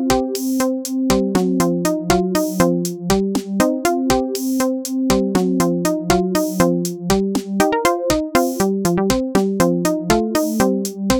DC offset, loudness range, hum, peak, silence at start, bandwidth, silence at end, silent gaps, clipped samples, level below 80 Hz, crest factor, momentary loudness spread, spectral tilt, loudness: 0.1%; 1 LU; none; 0 dBFS; 0 s; over 20 kHz; 0 s; none; under 0.1%; -38 dBFS; 18 dB; 3 LU; -5 dB/octave; -18 LUFS